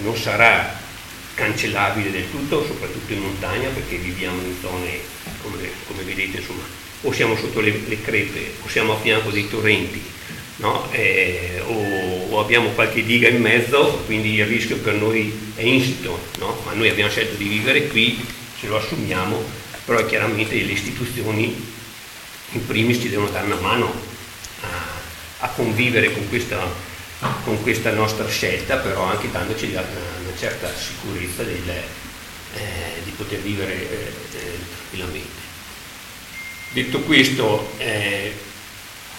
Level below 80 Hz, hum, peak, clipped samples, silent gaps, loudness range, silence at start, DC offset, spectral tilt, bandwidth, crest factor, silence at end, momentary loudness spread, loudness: -44 dBFS; none; 0 dBFS; under 0.1%; none; 10 LU; 0 s; under 0.1%; -4.5 dB/octave; 17 kHz; 22 dB; 0 s; 16 LU; -20 LUFS